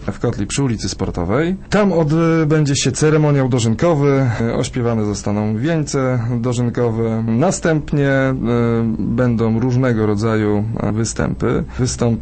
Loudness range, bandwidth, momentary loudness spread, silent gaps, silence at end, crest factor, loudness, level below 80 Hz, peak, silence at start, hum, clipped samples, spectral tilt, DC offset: 3 LU; 8.8 kHz; 5 LU; none; 0 s; 14 dB; -17 LUFS; -36 dBFS; -2 dBFS; 0 s; none; under 0.1%; -6 dB/octave; under 0.1%